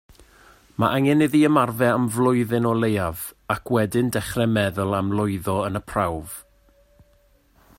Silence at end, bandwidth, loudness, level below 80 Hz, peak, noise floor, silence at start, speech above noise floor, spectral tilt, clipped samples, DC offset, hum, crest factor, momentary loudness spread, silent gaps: 1.35 s; 16.5 kHz; -22 LUFS; -50 dBFS; -4 dBFS; -59 dBFS; 0.8 s; 38 dB; -6 dB/octave; under 0.1%; under 0.1%; none; 18 dB; 10 LU; none